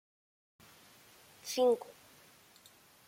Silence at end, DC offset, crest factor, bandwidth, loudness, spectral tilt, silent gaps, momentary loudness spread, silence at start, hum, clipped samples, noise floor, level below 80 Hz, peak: 1.15 s; under 0.1%; 18 dB; 16.5 kHz; -32 LUFS; -2.5 dB/octave; none; 27 LU; 1.45 s; none; under 0.1%; -62 dBFS; -84 dBFS; -20 dBFS